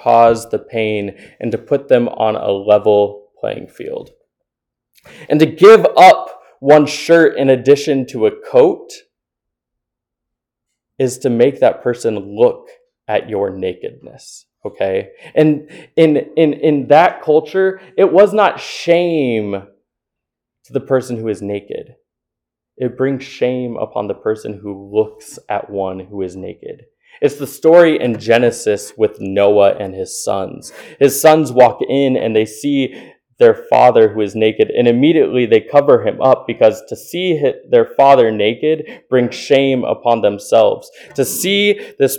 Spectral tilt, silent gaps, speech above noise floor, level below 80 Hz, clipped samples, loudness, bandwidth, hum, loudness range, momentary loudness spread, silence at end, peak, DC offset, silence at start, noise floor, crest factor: -5 dB/octave; none; 69 dB; -60 dBFS; 0.2%; -13 LUFS; 19 kHz; none; 10 LU; 15 LU; 0 s; 0 dBFS; under 0.1%; 0.05 s; -82 dBFS; 14 dB